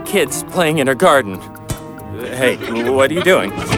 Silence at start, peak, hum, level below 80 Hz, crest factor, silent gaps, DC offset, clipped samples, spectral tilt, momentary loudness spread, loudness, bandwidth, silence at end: 0 s; -2 dBFS; none; -42 dBFS; 14 dB; none; under 0.1%; under 0.1%; -4.5 dB/octave; 15 LU; -15 LUFS; 18.5 kHz; 0 s